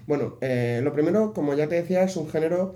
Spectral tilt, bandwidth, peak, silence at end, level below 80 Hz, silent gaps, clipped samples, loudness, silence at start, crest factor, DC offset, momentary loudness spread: -7.5 dB/octave; 14.5 kHz; -10 dBFS; 0 s; -62 dBFS; none; under 0.1%; -24 LUFS; 0 s; 14 dB; under 0.1%; 4 LU